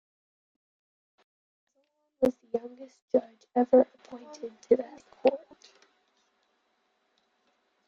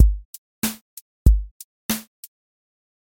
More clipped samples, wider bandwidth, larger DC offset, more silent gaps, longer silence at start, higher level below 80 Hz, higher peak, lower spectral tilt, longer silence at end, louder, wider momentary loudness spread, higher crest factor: neither; second, 7.4 kHz vs 17 kHz; neither; second, 3.02-3.08 s vs 0.25-0.62 s, 0.81-1.25 s, 1.51-1.89 s; first, 2.2 s vs 0 s; second, -72 dBFS vs -24 dBFS; second, -8 dBFS vs -2 dBFS; first, -6.5 dB/octave vs -5 dB/octave; first, 2.5 s vs 1.1 s; second, -28 LUFS vs -24 LUFS; second, 21 LU vs 24 LU; about the same, 24 dB vs 20 dB